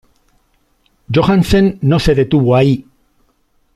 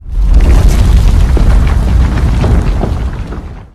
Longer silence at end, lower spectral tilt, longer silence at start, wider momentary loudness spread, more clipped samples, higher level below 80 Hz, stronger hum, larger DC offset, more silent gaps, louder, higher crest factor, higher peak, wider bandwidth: first, 0.95 s vs 0.1 s; about the same, -7.5 dB/octave vs -7 dB/octave; first, 1.1 s vs 0.05 s; second, 4 LU vs 10 LU; second, under 0.1% vs 3%; second, -32 dBFS vs -8 dBFS; neither; neither; neither; about the same, -13 LUFS vs -11 LUFS; about the same, 12 dB vs 8 dB; about the same, -2 dBFS vs 0 dBFS; about the same, 13.5 kHz vs 12.5 kHz